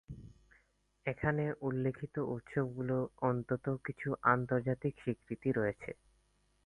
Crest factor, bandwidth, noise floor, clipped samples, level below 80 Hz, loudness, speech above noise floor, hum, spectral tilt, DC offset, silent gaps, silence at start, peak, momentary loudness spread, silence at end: 24 dB; 10.5 kHz; -73 dBFS; under 0.1%; -62 dBFS; -36 LUFS; 38 dB; none; -9.5 dB/octave; under 0.1%; none; 0.1 s; -14 dBFS; 10 LU; 0.7 s